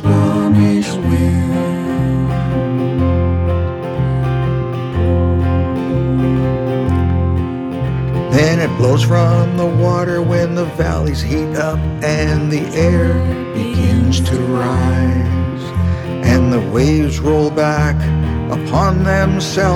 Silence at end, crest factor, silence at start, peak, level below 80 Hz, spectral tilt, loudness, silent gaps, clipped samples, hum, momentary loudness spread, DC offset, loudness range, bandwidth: 0 s; 14 dB; 0 s; 0 dBFS; -26 dBFS; -7 dB/octave; -15 LUFS; none; under 0.1%; none; 5 LU; under 0.1%; 2 LU; 13 kHz